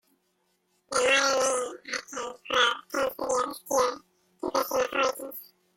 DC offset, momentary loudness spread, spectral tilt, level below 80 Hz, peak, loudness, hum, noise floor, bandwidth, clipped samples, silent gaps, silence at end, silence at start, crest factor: under 0.1%; 15 LU; -0.5 dB/octave; -66 dBFS; -8 dBFS; -27 LUFS; none; -73 dBFS; 17 kHz; under 0.1%; none; 0.35 s; 0.9 s; 20 dB